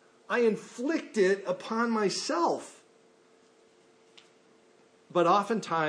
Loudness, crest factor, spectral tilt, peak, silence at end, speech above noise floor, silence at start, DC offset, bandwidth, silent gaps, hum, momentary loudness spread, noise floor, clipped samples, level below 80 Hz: -28 LUFS; 18 dB; -4.5 dB/octave; -12 dBFS; 0 s; 34 dB; 0.3 s; under 0.1%; 10.5 kHz; none; none; 8 LU; -62 dBFS; under 0.1%; -88 dBFS